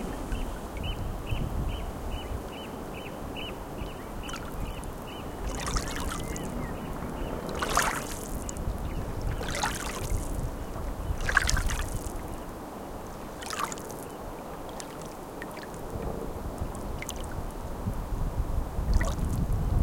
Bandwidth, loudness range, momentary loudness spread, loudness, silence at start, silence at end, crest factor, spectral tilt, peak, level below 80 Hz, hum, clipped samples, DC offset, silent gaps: 17 kHz; 7 LU; 10 LU; -34 LUFS; 0 s; 0 s; 30 dB; -4.5 dB/octave; -2 dBFS; -36 dBFS; none; under 0.1%; under 0.1%; none